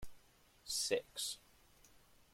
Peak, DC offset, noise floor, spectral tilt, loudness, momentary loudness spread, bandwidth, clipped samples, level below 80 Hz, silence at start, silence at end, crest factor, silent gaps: -22 dBFS; under 0.1%; -68 dBFS; -0.5 dB/octave; -40 LUFS; 20 LU; 16.5 kHz; under 0.1%; -66 dBFS; 0 s; 0.1 s; 24 dB; none